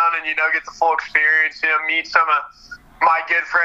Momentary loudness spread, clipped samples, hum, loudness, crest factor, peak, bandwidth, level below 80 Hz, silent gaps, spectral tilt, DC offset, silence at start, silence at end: 5 LU; under 0.1%; none; -17 LUFS; 18 dB; 0 dBFS; 8.2 kHz; -58 dBFS; none; -1.5 dB/octave; under 0.1%; 0 s; 0 s